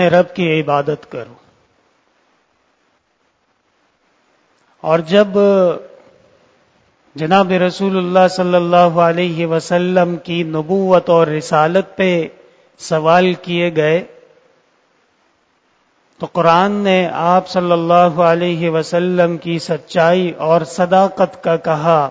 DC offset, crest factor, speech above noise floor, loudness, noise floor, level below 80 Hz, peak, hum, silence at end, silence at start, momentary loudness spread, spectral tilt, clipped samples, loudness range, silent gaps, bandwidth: under 0.1%; 16 dB; 48 dB; -14 LUFS; -62 dBFS; -60 dBFS; 0 dBFS; none; 0 s; 0 s; 8 LU; -6.5 dB/octave; under 0.1%; 6 LU; none; 8 kHz